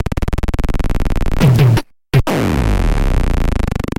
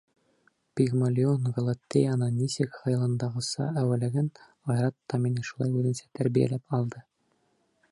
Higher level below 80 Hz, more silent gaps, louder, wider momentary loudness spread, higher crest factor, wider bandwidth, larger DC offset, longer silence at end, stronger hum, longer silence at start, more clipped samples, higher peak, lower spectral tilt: first, -18 dBFS vs -66 dBFS; neither; first, -16 LUFS vs -28 LUFS; first, 9 LU vs 6 LU; second, 12 dB vs 18 dB; first, 16.5 kHz vs 11.5 kHz; neither; second, 0.1 s vs 0.9 s; neither; second, 0 s vs 0.75 s; neither; first, 0 dBFS vs -10 dBFS; about the same, -7 dB/octave vs -7 dB/octave